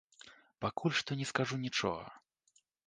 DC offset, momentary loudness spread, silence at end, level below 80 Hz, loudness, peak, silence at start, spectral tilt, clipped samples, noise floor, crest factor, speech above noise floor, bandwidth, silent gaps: under 0.1%; 23 LU; 0.7 s; -68 dBFS; -36 LUFS; -14 dBFS; 0.25 s; -4.5 dB/octave; under 0.1%; -74 dBFS; 26 dB; 38 dB; 10 kHz; none